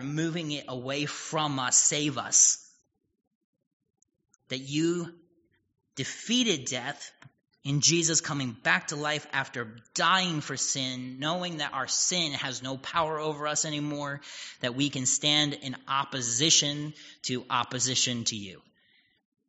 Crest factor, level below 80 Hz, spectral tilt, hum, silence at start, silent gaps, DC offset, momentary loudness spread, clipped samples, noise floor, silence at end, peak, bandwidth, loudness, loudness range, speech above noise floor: 24 dB; -70 dBFS; -2.5 dB/octave; none; 0 s; 3.27-3.53 s, 3.67-3.80 s; under 0.1%; 15 LU; under 0.1%; -70 dBFS; 0.9 s; -6 dBFS; 8 kHz; -27 LUFS; 6 LU; 41 dB